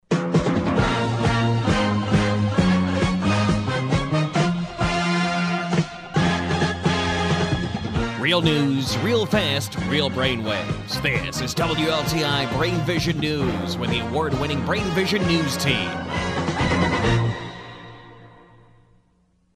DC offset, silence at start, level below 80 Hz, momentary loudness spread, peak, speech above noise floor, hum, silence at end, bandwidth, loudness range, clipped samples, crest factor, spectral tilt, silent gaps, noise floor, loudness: under 0.1%; 0.1 s; -40 dBFS; 5 LU; -6 dBFS; 40 dB; none; 1.25 s; 15.5 kHz; 2 LU; under 0.1%; 16 dB; -5.5 dB/octave; none; -62 dBFS; -22 LUFS